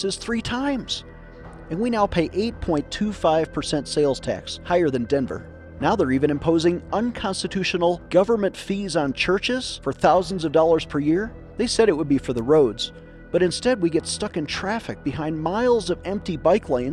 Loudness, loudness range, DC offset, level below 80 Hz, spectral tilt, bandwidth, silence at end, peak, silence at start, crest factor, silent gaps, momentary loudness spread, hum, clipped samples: -22 LUFS; 3 LU; under 0.1%; -44 dBFS; -5 dB/octave; 12 kHz; 0 s; -6 dBFS; 0 s; 16 dB; none; 9 LU; none; under 0.1%